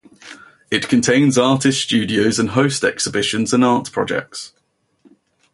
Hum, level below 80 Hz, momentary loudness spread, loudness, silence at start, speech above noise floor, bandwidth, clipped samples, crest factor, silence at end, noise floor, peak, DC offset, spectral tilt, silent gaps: none; -54 dBFS; 8 LU; -17 LUFS; 0.25 s; 39 dB; 11.5 kHz; under 0.1%; 16 dB; 1.05 s; -56 dBFS; -2 dBFS; under 0.1%; -4 dB/octave; none